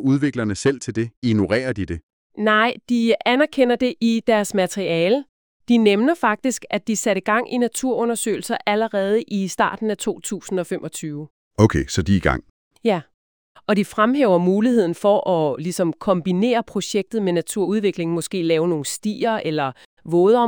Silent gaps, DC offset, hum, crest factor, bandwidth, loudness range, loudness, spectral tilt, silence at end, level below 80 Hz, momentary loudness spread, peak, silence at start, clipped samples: 1.17-1.22 s, 2.03-2.30 s, 5.29-5.60 s, 11.30-11.51 s, 12.50-12.71 s, 13.14-13.55 s, 19.85-19.97 s; under 0.1%; none; 18 dB; 19.5 kHz; 3 LU; -20 LUFS; -5 dB/octave; 0 s; -46 dBFS; 8 LU; -2 dBFS; 0 s; under 0.1%